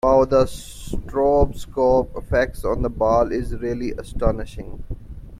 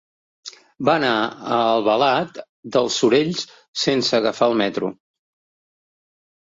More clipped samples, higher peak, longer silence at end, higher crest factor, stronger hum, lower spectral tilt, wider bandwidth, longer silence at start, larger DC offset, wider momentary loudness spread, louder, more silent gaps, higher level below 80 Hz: neither; about the same, -4 dBFS vs -2 dBFS; second, 0 s vs 1.65 s; about the same, 18 dB vs 18 dB; neither; first, -7 dB/octave vs -4 dB/octave; first, 15.5 kHz vs 7.8 kHz; second, 0.05 s vs 0.45 s; neither; about the same, 18 LU vs 16 LU; about the same, -21 LUFS vs -20 LUFS; second, none vs 2.49-2.63 s, 3.68-3.73 s; first, -30 dBFS vs -64 dBFS